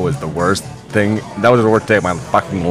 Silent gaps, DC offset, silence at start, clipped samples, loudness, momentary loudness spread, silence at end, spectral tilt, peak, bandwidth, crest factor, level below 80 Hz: none; under 0.1%; 0 s; under 0.1%; -15 LUFS; 7 LU; 0 s; -6 dB/octave; 0 dBFS; 15.5 kHz; 16 dB; -42 dBFS